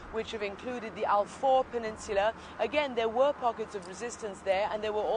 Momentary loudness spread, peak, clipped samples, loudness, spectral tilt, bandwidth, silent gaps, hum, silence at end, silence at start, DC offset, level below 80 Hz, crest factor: 11 LU; -14 dBFS; under 0.1%; -31 LUFS; -4 dB/octave; 10.5 kHz; none; none; 0 s; 0 s; under 0.1%; -58 dBFS; 16 dB